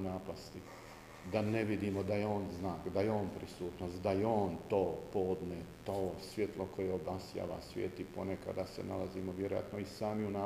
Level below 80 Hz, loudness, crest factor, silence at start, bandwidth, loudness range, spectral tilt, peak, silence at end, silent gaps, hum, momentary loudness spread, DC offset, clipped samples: -62 dBFS; -39 LUFS; 20 dB; 0 s; 15.5 kHz; 4 LU; -7 dB/octave; -20 dBFS; 0 s; none; none; 9 LU; under 0.1%; under 0.1%